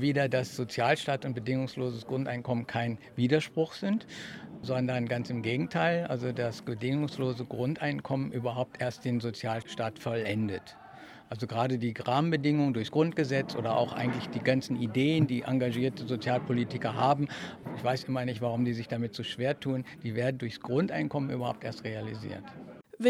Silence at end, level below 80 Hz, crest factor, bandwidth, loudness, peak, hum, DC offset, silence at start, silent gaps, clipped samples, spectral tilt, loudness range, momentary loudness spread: 0 s; -68 dBFS; 20 dB; 14 kHz; -31 LUFS; -10 dBFS; none; under 0.1%; 0 s; none; under 0.1%; -7 dB/octave; 4 LU; 10 LU